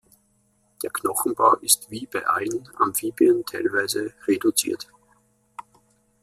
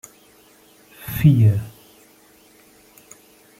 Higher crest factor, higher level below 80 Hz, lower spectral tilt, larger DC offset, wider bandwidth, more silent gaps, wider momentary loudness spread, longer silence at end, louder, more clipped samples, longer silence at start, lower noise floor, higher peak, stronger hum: about the same, 24 dB vs 20 dB; second, -66 dBFS vs -48 dBFS; second, -2.5 dB/octave vs -7.5 dB/octave; neither; about the same, 16 kHz vs 16 kHz; neither; second, 17 LU vs 24 LU; second, 0.6 s vs 1.9 s; second, -22 LUFS vs -18 LUFS; neither; second, 0.8 s vs 1 s; first, -65 dBFS vs -52 dBFS; about the same, -2 dBFS vs -2 dBFS; neither